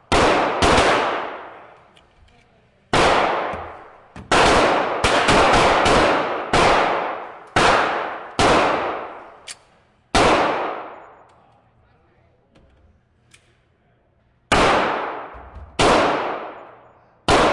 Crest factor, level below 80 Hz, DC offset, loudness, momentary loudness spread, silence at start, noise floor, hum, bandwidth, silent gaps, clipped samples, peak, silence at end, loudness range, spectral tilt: 16 dB; -38 dBFS; under 0.1%; -18 LUFS; 21 LU; 0.1 s; -60 dBFS; none; 11.5 kHz; none; under 0.1%; -4 dBFS; 0 s; 7 LU; -3.5 dB/octave